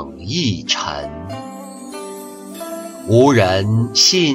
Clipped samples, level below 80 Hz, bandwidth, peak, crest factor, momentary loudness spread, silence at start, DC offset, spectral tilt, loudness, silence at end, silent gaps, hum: under 0.1%; -48 dBFS; 16 kHz; -2 dBFS; 16 dB; 20 LU; 0 s; under 0.1%; -4 dB/octave; -15 LUFS; 0 s; none; none